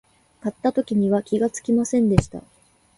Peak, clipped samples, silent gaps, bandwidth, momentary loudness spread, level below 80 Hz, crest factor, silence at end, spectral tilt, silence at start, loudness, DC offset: 0 dBFS; under 0.1%; none; 11.5 kHz; 12 LU; -44 dBFS; 22 dB; 0.55 s; -7 dB/octave; 0.45 s; -22 LUFS; under 0.1%